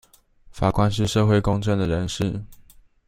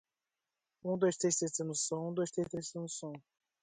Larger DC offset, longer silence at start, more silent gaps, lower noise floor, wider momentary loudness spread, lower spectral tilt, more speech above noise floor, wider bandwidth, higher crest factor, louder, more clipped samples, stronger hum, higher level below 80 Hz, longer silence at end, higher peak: neither; second, 0.55 s vs 0.85 s; neither; second, -51 dBFS vs under -90 dBFS; second, 8 LU vs 12 LU; first, -6.5 dB/octave vs -4.5 dB/octave; second, 30 dB vs over 54 dB; first, 14.5 kHz vs 9.6 kHz; about the same, 18 dB vs 18 dB; first, -22 LUFS vs -36 LUFS; neither; neither; first, -40 dBFS vs -76 dBFS; about the same, 0.45 s vs 0.45 s; first, -4 dBFS vs -18 dBFS